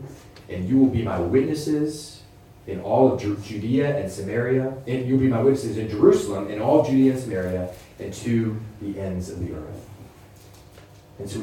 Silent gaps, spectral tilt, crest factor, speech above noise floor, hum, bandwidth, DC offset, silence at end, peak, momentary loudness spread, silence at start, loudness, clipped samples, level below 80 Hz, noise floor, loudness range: none; -7.5 dB/octave; 20 dB; 25 dB; none; 15.5 kHz; under 0.1%; 0 s; -4 dBFS; 17 LU; 0 s; -23 LUFS; under 0.1%; -50 dBFS; -47 dBFS; 9 LU